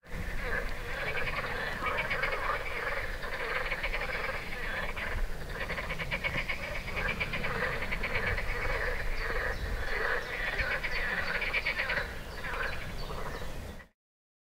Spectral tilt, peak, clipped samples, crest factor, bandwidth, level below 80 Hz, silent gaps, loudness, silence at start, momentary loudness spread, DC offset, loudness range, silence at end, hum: -4 dB/octave; -16 dBFS; under 0.1%; 18 dB; 16 kHz; -40 dBFS; none; -33 LUFS; 0.05 s; 8 LU; under 0.1%; 3 LU; 0.65 s; none